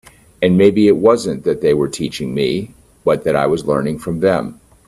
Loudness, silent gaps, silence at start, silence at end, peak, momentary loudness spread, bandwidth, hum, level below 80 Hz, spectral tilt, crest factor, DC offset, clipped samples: -16 LUFS; none; 0.4 s; 0.35 s; 0 dBFS; 10 LU; 13 kHz; none; -48 dBFS; -6.5 dB/octave; 16 dB; under 0.1%; under 0.1%